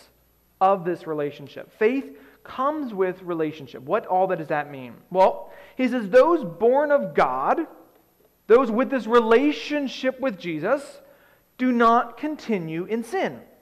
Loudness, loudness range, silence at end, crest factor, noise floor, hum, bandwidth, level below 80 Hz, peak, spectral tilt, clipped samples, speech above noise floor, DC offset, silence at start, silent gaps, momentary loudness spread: -23 LUFS; 5 LU; 0.2 s; 16 dB; -61 dBFS; none; 12.5 kHz; -62 dBFS; -8 dBFS; -6.5 dB/octave; under 0.1%; 39 dB; under 0.1%; 0.6 s; none; 13 LU